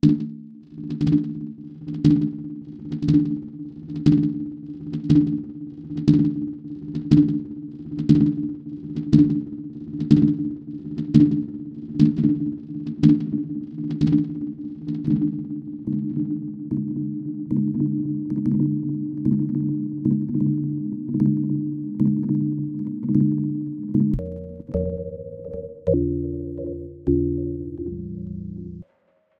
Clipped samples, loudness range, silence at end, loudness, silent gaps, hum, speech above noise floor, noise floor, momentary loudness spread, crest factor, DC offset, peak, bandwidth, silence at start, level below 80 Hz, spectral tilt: under 0.1%; 5 LU; 0.55 s; -23 LUFS; none; none; 46 dB; -64 dBFS; 15 LU; 22 dB; under 0.1%; -2 dBFS; 6.4 kHz; 0.05 s; -44 dBFS; -10.5 dB/octave